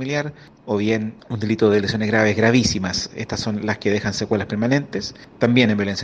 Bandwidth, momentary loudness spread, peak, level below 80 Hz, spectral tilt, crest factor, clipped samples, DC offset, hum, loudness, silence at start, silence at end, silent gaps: 9.4 kHz; 11 LU; 0 dBFS; -48 dBFS; -5 dB/octave; 20 dB; under 0.1%; under 0.1%; none; -20 LUFS; 0 s; 0 s; none